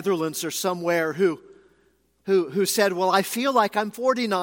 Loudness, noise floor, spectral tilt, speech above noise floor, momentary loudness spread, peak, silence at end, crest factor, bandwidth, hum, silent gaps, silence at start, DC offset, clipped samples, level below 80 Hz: -23 LUFS; -64 dBFS; -4 dB/octave; 41 dB; 5 LU; -4 dBFS; 0 s; 18 dB; 17 kHz; none; none; 0 s; under 0.1%; under 0.1%; -72 dBFS